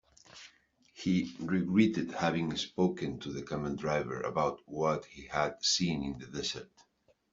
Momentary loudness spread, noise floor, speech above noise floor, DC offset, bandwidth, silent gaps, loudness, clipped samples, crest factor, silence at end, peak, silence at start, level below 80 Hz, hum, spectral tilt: 10 LU; -71 dBFS; 39 dB; under 0.1%; 7.8 kHz; none; -33 LUFS; under 0.1%; 20 dB; 0.65 s; -12 dBFS; 0.35 s; -62 dBFS; none; -4.5 dB/octave